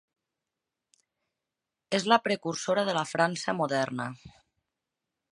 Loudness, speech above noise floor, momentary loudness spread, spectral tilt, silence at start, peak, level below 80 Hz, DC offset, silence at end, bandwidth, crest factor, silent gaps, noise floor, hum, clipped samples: -28 LUFS; 60 dB; 10 LU; -4 dB/octave; 1.9 s; -6 dBFS; -72 dBFS; under 0.1%; 1 s; 11.5 kHz; 24 dB; none; -88 dBFS; none; under 0.1%